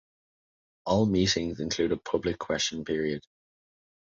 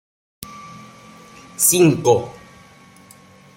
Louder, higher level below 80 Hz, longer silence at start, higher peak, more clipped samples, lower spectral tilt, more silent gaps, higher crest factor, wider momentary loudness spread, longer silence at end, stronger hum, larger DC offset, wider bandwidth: second, -28 LUFS vs -15 LUFS; first, -52 dBFS vs -58 dBFS; first, 0.85 s vs 0.4 s; second, -12 dBFS vs -2 dBFS; neither; about the same, -4.5 dB/octave vs -4.5 dB/octave; neither; about the same, 18 dB vs 20 dB; second, 8 LU vs 25 LU; second, 0.85 s vs 1.25 s; neither; neither; second, 7.8 kHz vs 16.5 kHz